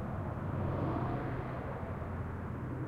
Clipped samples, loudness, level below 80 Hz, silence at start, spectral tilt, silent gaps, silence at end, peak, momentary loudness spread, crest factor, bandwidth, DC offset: under 0.1%; -38 LUFS; -48 dBFS; 0 s; -9.5 dB/octave; none; 0 s; -24 dBFS; 5 LU; 14 dB; 5.4 kHz; under 0.1%